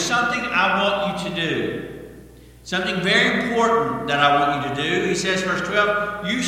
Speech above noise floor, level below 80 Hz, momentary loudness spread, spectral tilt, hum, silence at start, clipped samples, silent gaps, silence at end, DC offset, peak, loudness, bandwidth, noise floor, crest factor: 23 dB; -50 dBFS; 8 LU; -4 dB/octave; none; 0 s; under 0.1%; none; 0 s; under 0.1%; -2 dBFS; -20 LUFS; 16.5 kHz; -44 dBFS; 18 dB